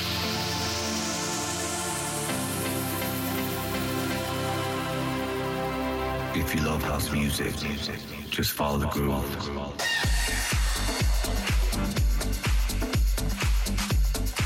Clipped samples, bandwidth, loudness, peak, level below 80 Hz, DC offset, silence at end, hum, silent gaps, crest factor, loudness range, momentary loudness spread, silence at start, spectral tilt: under 0.1%; 17 kHz; -28 LUFS; -16 dBFS; -32 dBFS; under 0.1%; 0 s; none; none; 12 dB; 2 LU; 3 LU; 0 s; -4 dB/octave